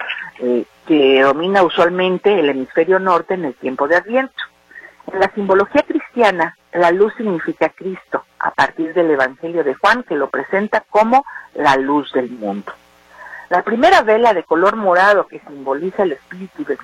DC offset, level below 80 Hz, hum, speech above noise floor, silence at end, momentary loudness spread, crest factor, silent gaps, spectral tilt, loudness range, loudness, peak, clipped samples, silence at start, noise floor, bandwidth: under 0.1%; -54 dBFS; none; 25 dB; 0 s; 13 LU; 16 dB; none; -5.5 dB/octave; 3 LU; -16 LUFS; 0 dBFS; under 0.1%; 0 s; -41 dBFS; 11.5 kHz